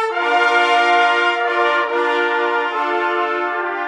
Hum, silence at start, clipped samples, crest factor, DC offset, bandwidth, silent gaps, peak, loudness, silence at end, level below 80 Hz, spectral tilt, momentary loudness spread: none; 0 s; under 0.1%; 14 dB; under 0.1%; 11 kHz; none; -2 dBFS; -16 LUFS; 0 s; -82 dBFS; -0.5 dB/octave; 5 LU